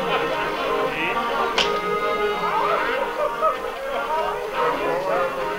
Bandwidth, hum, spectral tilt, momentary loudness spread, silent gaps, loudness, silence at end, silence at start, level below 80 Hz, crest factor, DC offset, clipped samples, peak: 16 kHz; none; -3.5 dB/octave; 4 LU; none; -22 LUFS; 0 s; 0 s; -48 dBFS; 16 dB; under 0.1%; under 0.1%; -6 dBFS